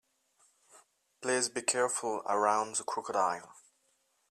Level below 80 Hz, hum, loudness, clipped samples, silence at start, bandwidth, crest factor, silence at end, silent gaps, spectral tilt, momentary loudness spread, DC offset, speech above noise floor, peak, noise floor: -84 dBFS; none; -32 LUFS; under 0.1%; 0.75 s; 14 kHz; 22 dB; 0.7 s; none; -1.5 dB/octave; 6 LU; under 0.1%; 43 dB; -12 dBFS; -75 dBFS